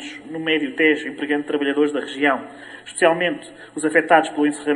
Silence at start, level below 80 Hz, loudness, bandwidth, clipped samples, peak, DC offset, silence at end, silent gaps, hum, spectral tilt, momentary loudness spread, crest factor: 0 s; -70 dBFS; -20 LUFS; 11.5 kHz; under 0.1%; -2 dBFS; under 0.1%; 0 s; none; none; -4 dB/octave; 16 LU; 20 dB